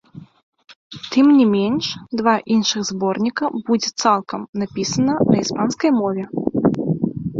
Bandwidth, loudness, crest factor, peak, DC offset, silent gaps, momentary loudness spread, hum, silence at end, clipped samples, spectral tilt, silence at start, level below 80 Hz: 7.8 kHz; -19 LUFS; 16 dB; -2 dBFS; under 0.1%; 0.43-0.53 s, 0.75-0.90 s, 4.49-4.53 s; 9 LU; none; 0 s; under 0.1%; -5 dB/octave; 0.15 s; -54 dBFS